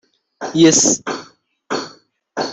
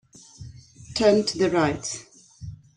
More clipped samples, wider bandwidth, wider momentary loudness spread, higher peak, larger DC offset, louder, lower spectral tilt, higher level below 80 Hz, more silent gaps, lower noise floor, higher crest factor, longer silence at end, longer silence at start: neither; second, 8.4 kHz vs 11 kHz; second, 20 LU vs 24 LU; first, -2 dBFS vs -6 dBFS; neither; first, -15 LUFS vs -23 LUFS; second, -3 dB/octave vs -4.5 dB/octave; second, -60 dBFS vs -52 dBFS; neither; about the same, -47 dBFS vs -44 dBFS; about the same, 18 dB vs 20 dB; second, 0 s vs 0.2 s; about the same, 0.4 s vs 0.4 s